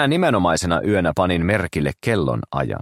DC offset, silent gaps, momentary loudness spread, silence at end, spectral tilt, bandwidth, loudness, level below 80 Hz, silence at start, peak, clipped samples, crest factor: under 0.1%; none; 6 LU; 0 s; -5.5 dB/octave; 15 kHz; -20 LUFS; -40 dBFS; 0 s; -2 dBFS; under 0.1%; 16 dB